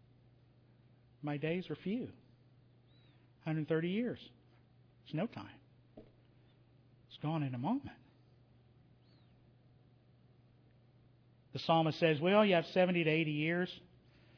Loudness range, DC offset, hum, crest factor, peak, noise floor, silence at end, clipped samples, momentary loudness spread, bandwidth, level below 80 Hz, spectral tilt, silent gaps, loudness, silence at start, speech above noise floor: 13 LU; under 0.1%; none; 22 dB; -16 dBFS; -66 dBFS; 0.6 s; under 0.1%; 19 LU; 5.4 kHz; -76 dBFS; -8 dB/octave; none; -35 LUFS; 1.25 s; 32 dB